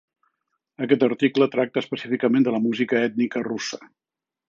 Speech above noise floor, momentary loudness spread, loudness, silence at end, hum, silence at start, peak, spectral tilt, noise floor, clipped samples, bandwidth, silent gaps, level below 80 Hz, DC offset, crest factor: 55 dB; 9 LU; -22 LUFS; 0.65 s; none; 0.8 s; -4 dBFS; -5.5 dB/octave; -77 dBFS; under 0.1%; 7.6 kHz; none; -72 dBFS; under 0.1%; 20 dB